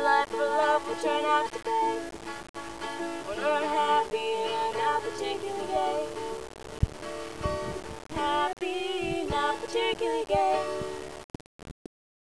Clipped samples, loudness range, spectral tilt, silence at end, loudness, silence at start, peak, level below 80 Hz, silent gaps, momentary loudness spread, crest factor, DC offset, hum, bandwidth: under 0.1%; 3 LU; -4.5 dB/octave; 0.5 s; -29 LUFS; 0 s; -10 dBFS; -48 dBFS; 2.49-2.54 s, 11.24-11.34 s, 11.41-11.59 s; 14 LU; 18 dB; 0.4%; none; 11 kHz